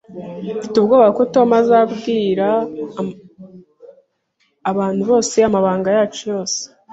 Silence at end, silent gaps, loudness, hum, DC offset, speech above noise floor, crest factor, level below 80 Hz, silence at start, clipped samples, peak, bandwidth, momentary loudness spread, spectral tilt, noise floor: 0.25 s; none; -16 LUFS; none; under 0.1%; 49 dB; 16 dB; -58 dBFS; 0.1 s; under 0.1%; -2 dBFS; 8.2 kHz; 14 LU; -5 dB/octave; -65 dBFS